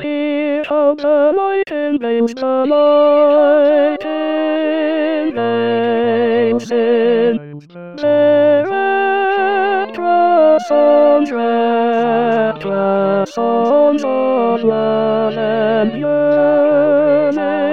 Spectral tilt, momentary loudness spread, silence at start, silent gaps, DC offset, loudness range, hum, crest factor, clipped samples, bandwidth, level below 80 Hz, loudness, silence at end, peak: -6.5 dB/octave; 7 LU; 0 s; none; 0.7%; 2 LU; none; 12 dB; under 0.1%; 7 kHz; -64 dBFS; -14 LUFS; 0 s; -2 dBFS